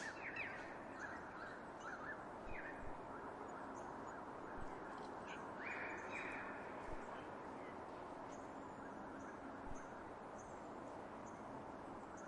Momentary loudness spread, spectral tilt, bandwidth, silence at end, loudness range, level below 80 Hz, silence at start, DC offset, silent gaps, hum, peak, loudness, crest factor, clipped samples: 6 LU; -5 dB/octave; 11 kHz; 0 s; 3 LU; -66 dBFS; 0 s; under 0.1%; none; none; -34 dBFS; -51 LUFS; 16 dB; under 0.1%